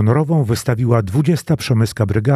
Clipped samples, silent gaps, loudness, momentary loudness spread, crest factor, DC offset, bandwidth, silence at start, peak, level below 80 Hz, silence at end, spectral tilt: under 0.1%; none; -17 LUFS; 2 LU; 14 dB; under 0.1%; 14 kHz; 0 s; 0 dBFS; -44 dBFS; 0 s; -7 dB/octave